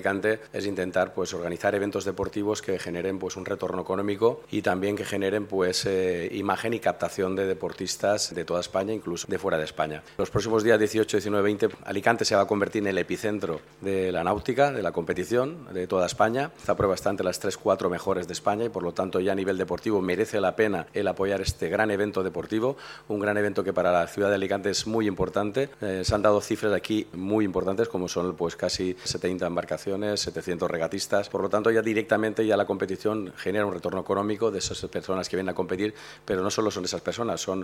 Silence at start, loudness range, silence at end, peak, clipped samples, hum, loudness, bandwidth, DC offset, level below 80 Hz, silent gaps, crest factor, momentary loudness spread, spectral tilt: 0 s; 3 LU; 0 s; -4 dBFS; under 0.1%; none; -27 LUFS; 16 kHz; under 0.1%; -52 dBFS; none; 22 dB; 6 LU; -4.5 dB/octave